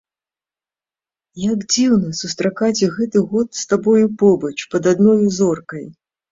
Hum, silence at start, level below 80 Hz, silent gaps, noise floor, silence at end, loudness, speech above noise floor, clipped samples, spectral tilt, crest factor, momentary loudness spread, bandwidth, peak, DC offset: none; 1.35 s; -56 dBFS; none; under -90 dBFS; 0.4 s; -17 LUFS; over 74 dB; under 0.1%; -5 dB/octave; 16 dB; 9 LU; 7.8 kHz; -2 dBFS; under 0.1%